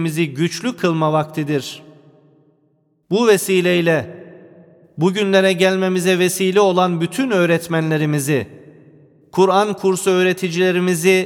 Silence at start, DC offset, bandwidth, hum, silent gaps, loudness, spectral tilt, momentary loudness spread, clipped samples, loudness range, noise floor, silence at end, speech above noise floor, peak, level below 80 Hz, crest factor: 0 s; under 0.1%; 18 kHz; none; none; -17 LUFS; -5 dB/octave; 7 LU; under 0.1%; 4 LU; -61 dBFS; 0 s; 45 dB; -2 dBFS; -64 dBFS; 16 dB